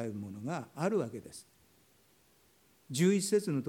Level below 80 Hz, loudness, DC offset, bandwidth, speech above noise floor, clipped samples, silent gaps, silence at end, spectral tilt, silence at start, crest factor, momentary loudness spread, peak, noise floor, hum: -78 dBFS; -33 LUFS; under 0.1%; 18 kHz; 34 dB; under 0.1%; none; 0 s; -5.5 dB/octave; 0 s; 18 dB; 18 LU; -18 dBFS; -67 dBFS; none